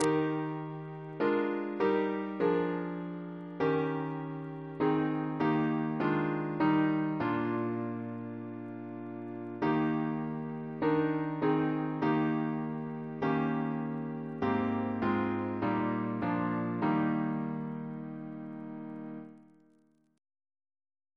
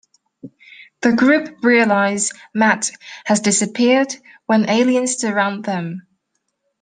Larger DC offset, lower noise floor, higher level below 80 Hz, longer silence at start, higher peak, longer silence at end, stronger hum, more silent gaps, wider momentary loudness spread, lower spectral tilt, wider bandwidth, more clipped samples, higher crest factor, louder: neither; second, -68 dBFS vs -72 dBFS; second, -70 dBFS vs -64 dBFS; second, 0 s vs 0.45 s; second, -16 dBFS vs -2 dBFS; first, 1.75 s vs 0.8 s; neither; neither; about the same, 12 LU vs 10 LU; first, -8 dB/octave vs -3.5 dB/octave; about the same, 11 kHz vs 10 kHz; neither; about the same, 16 dB vs 18 dB; second, -33 LUFS vs -17 LUFS